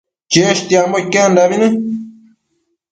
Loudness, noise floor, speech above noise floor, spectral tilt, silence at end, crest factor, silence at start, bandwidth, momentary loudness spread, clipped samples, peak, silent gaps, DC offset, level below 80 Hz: -13 LUFS; -67 dBFS; 55 dB; -4 dB/octave; 0.8 s; 14 dB; 0.3 s; 9.4 kHz; 8 LU; under 0.1%; 0 dBFS; none; under 0.1%; -58 dBFS